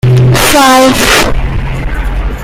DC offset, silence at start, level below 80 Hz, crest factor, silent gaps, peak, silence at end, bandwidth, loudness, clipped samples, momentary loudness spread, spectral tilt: under 0.1%; 0.05 s; -16 dBFS; 8 dB; none; 0 dBFS; 0 s; 16.5 kHz; -8 LUFS; 0.6%; 12 LU; -4.5 dB/octave